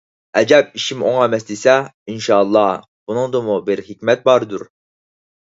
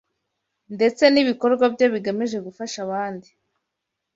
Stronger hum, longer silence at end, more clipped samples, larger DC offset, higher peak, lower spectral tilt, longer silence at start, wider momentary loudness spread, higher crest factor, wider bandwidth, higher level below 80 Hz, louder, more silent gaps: neither; second, 0.8 s vs 0.95 s; neither; neither; about the same, 0 dBFS vs -2 dBFS; about the same, -4.5 dB/octave vs -4.5 dB/octave; second, 0.35 s vs 0.7 s; second, 12 LU vs 15 LU; about the same, 16 dB vs 20 dB; about the same, 8 kHz vs 8 kHz; first, -62 dBFS vs -68 dBFS; first, -16 LUFS vs -21 LUFS; first, 1.94-2.06 s, 2.88-3.07 s vs none